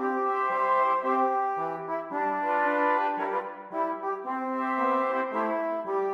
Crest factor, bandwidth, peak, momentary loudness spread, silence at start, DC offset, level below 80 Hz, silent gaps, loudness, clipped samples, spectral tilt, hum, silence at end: 14 dB; 7.6 kHz; -14 dBFS; 7 LU; 0 s; under 0.1%; -84 dBFS; none; -28 LUFS; under 0.1%; -6.5 dB/octave; none; 0 s